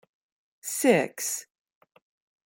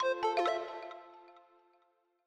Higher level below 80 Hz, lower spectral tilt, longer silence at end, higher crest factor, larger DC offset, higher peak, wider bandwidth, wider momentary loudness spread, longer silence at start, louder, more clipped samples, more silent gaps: about the same, -78 dBFS vs -82 dBFS; about the same, -3.5 dB/octave vs -2.5 dB/octave; first, 1.05 s vs 0.9 s; first, 24 dB vs 18 dB; neither; first, -6 dBFS vs -20 dBFS; first, 17 kHz vs 10 kHz; second, 12 LU vs 20 LU; first, 0.65 s vs 0 s; first, -26 LUFS vs -34 LUFS; neither; neither